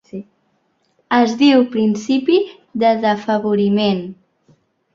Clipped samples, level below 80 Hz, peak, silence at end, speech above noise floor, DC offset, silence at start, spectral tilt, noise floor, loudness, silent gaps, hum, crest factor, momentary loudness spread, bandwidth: under 0.1%; -62 dBFS; -2 dBFS; 0.8 s; 49 dB; under 0.1%; 0.15 s; -6 dB/octave; -64 dBFS; -16 LUFS; none; none; 16 dB; 12 LU; 7.6 kHz